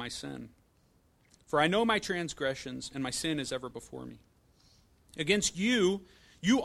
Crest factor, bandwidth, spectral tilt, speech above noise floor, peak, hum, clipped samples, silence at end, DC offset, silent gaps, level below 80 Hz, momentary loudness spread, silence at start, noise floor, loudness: 20 dB; 14.5 kHz; -3.5 dB/octave; 36 dB; -12 dBFS; none; under 0.1%; 0 s; under 0.1%; none; -60 dBFS; 18 LU; 0 s; -67 dBFS; -31 LUFS